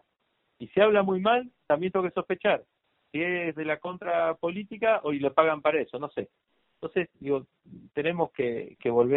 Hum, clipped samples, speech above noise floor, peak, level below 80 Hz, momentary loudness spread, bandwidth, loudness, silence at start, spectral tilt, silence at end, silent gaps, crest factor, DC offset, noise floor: none; under 0.1%; 48 dB; -6 dBFS; -68 dBFS; 10 LU; 4.1 kHz; -28 LUFS; 0.6 s; -4 dB/octave; 0 s; none; 22 dB; under 0.1%; -75 dBFS